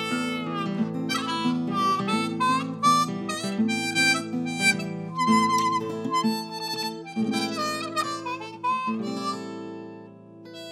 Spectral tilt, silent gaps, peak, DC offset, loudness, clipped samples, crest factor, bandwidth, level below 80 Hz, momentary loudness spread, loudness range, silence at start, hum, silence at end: -4 dB/octave; none; -8 dBFS; under 0.1%; -25 LUFS; under 0.1%; 18 dB; 16 kHz; -74 dBFS; 11 LU; 6 LU; 0 s; none; 0 s